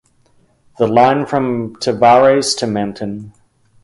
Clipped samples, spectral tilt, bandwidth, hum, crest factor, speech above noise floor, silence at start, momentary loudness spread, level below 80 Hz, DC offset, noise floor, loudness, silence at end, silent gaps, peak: under 0.1%; -4.5 dB/octave; 11.5 kHz; none; 16 dB; 41 dB; 0.8 s; 14 LU; -54 dBFS; under 0.1%; -54 dBFS; -14 LUFS; 0.55 s; none; 0 dBFS